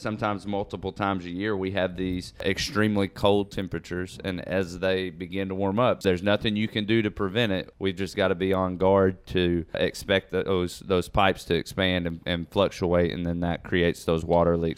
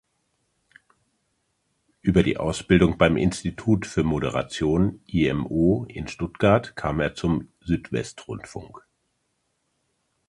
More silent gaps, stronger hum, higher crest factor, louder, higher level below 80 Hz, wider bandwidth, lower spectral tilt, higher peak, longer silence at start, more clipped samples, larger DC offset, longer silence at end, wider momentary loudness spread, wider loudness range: neither; neither; about the same, 18 dB vs 22 dB; second, -26 LUFS vs -23 LUFS; second, -48 dBFS vs -42 dBFS; first, 16 kHz vs 11.5 kHz; about the same, -6 dB/octave vs -6.5 dB/octave; second, -6 dBFS vs -2 dBFS; second, 0 s vs 2.05 s; neither; neither; second, 0.05 s vs 1.5 s; second, 8 LU vs 13 LU; second, 2 LU vs 5 LU